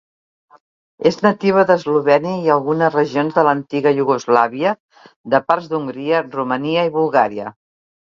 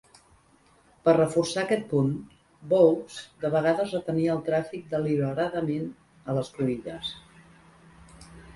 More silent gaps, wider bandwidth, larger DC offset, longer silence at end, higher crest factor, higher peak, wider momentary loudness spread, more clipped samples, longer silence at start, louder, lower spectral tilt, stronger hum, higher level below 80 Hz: first, 4.80-4.89 s, 5.16-5.24 s vs none; second, 7.4 kHz vs 11.5 kHz; neither; first, 0.6 s vs 0.05 s; about the same, 18 dB vs 20 dB; first, 0 dBFS vs -8 dBFS; second, 6 LU vs 14 LU; neither; about the same, 1 s vs 1.05 s; first, -17 LUFS vs -26 LUFS; about the same, -6.5 dB/octave vs -6.5 dB/octave; neither; about the same, -64 dBFS vs -60 dBFS